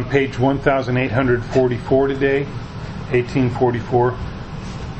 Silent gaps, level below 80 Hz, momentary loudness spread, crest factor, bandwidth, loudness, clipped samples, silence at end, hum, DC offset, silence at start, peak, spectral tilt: none; -36 dBFS; 13 LU; 18 dB; 8.4 kHz; -19 LUFS; under 0.1%; 0 s; none; under 0.1%; 0 s; 0 dBFS; -7.5 dB/octave